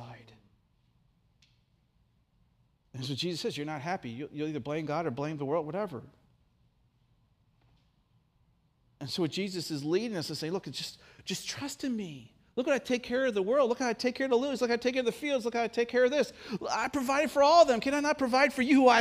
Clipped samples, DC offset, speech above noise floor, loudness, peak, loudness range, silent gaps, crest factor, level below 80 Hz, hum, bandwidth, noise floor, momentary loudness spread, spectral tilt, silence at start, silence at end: under 0.1%; under 0.1%; 41 dB; -30 LUFS; -10 dBFS; 13 LU; none; 22 dB; -68 dBFS; none; 15.5 kHz; -70 dBFS; 14 LU; -4.5 dB/octave; 0 s; 0 s